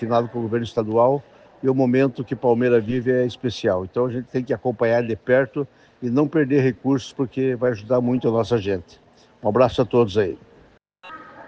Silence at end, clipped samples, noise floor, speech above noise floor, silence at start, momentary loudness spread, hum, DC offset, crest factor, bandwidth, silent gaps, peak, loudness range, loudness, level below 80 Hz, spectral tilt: 0 s; under 0.1%; -54 dBFS; 33 dB; 0 s; 9 LU; none; under 0.1%; 18 dB; 8 kHz; none; -4 dBFS; 2 LU; -21 LUFS; -56 dBFS; -7.5 dB/octave